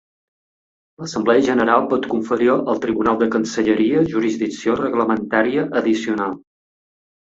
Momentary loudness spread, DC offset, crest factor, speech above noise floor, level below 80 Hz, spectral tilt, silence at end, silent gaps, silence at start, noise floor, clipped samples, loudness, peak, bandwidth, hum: 6 LU; under 0.1%; 18 dB; over 72 dB; -56 dBFS; -5.5 dB/octave; 1 s; none; 1 s; under -90 dBFS; under 0.1%; -18 LUFS; -2 dBFS; 7.8 kHz; none